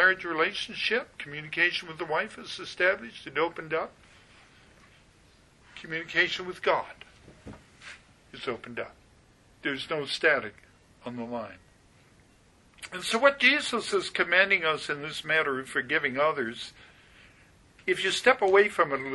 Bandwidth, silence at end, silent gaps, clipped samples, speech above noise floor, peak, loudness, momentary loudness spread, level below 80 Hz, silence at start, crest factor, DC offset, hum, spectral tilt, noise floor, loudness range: 11.5 kHz; 0 s; none; under 0.1%; 32 dB; -6 dBFS; -27 LUFS; 20 LU; -64 dBFS; 0 s; 24 dB; under 0.1%; none; -3 dB/octave; -60 dBFS; 8 LU